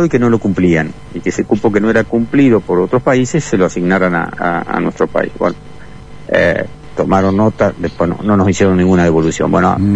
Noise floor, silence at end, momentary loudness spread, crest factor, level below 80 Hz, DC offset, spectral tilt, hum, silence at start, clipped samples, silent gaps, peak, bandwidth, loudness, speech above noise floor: -33 dBFS; 0 s; 8 LU; 12 dB; -38 dBFS; 2%; -7 dB/octave; 50 Hz at -40 dBFS; 0 s; under 0.1%; none; 0 dBFS; 9.6 kHz; -13 LUFS; 20 dB